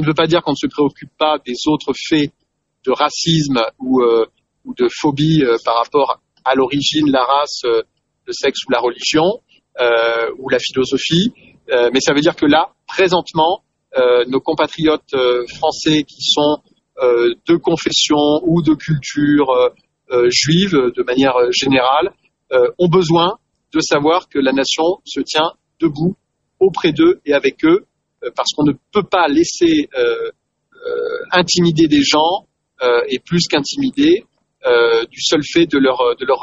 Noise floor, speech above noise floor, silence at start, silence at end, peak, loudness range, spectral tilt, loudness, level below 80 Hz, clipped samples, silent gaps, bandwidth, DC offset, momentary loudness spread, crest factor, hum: -37 dBFS; 23 dB; 0 s; 0 s; 0 dBFS; 2 LU; -4.5 dB/octave; -15 LUFS; -50 dBFS; under 0.1%; none; 8 kHz; under 0.1%; 7 LU; 16 dB; none